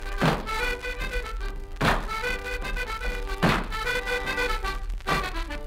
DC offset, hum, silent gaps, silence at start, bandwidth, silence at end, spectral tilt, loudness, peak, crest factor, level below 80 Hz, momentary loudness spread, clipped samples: under 0.1%; none; none; 0 s; 16 kHz; 0 s; -4.5 dB/octave; -28 LUFS; -8 dBFS; 20 dB; -32 dBFS; 8 LU; under 0.1%